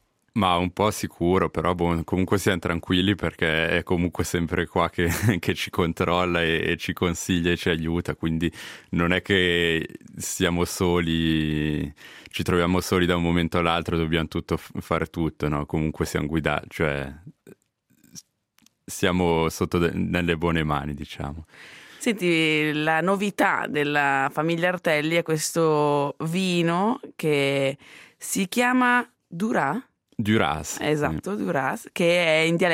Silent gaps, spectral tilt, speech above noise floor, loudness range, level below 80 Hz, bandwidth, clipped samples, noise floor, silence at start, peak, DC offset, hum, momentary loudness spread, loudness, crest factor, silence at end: none; -5 dB/octave; 42 dB; 4 LU; -48 dBFS; 16 kHz; under 0.1%; -66 dBFS; 0.35 s; -4 dBFS; under 0.1%; none; 9 LU; -24 LUFS; 20 dB; 0 s